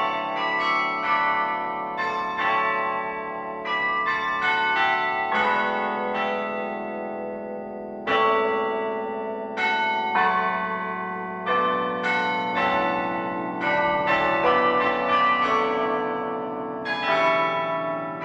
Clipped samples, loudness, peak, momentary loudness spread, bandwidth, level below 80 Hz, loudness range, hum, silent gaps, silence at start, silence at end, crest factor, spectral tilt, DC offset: under 0.1%; -24 LUFS; -8 dBFS; 10 LU; 8.4 kHz; -60 dBFS; 4 LU; none; none; 0 s; 0 s; 16 dB; -5 dB/octave; under 0.1%